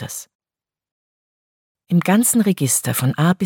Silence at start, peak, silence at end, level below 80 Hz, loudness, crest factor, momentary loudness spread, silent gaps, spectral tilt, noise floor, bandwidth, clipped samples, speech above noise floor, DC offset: 0 s; -4 dBFS; 0 s; -62 dBFS; -17 LUFS; 16 dB; 10 LU; 0.35-0.39 s, 0.91-1.75 s; -5 dB/octave; under -90 dBFS; 17.5 kHz; under 0.1%; over 73 dB; under 0.1%